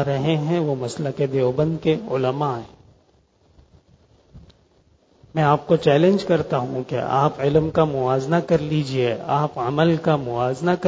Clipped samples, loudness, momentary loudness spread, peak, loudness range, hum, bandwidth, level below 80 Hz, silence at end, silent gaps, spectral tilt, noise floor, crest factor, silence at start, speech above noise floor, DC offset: under 0.1%; -21 LUFS; 7 LU; -4 dBFS; 9 LU; none; 8 kHz; -50 dBFS; 0 s; none; -7.5 dB/octave; -59 dBFS; 18 dB; 0 s; 39 dB; under 0.1%